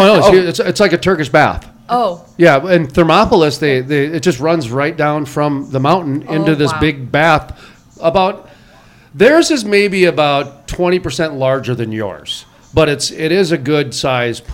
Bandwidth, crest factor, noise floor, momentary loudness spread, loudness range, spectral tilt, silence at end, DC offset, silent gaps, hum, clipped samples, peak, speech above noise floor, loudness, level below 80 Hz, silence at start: 16.5 kHz; 14 dB; -43 dBFS; 9 LU; 4 LU; -5.5 dB/octave; 0 s; under 0.1%; none; none; 0.3%; 0 dBFS; 31 dB; -13 LUFS; -38 dBFS; 0 s